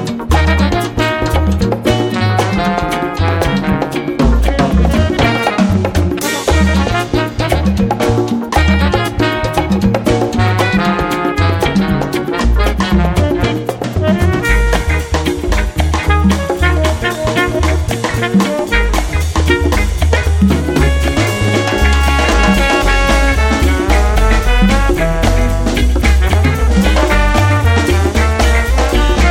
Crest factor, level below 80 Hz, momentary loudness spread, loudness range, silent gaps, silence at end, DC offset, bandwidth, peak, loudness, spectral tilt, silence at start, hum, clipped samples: 12 dB; -16 dBFS; 4 LU; 2 LU; none; 0 s; under 0.1%; 16.5 kHz; 0 dBFS; -13 LUFS; -5.5 dB/octave; 0 s; none; under 0.1%